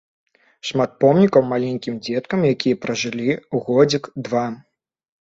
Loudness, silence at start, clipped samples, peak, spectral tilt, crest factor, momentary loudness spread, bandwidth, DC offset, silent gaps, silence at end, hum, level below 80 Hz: -19 LUFS; 0.65 s; under 0.1%; -2 dBFS; -6 dB/octave; 18 dB; 10 LU; 7.8 kHz; under 0.1%; none; 0.65 s; none; -60 dBFS